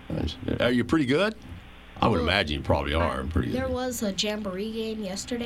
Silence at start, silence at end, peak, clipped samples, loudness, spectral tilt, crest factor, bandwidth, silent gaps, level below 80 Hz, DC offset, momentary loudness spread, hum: 0 s; 0 s; -6 dBFS; under 0.1%; -26 LUFS; -5 dB/octave; 20 dB; 16 kHz; none; -40 dBFS; under 0.1%; 9 LU; none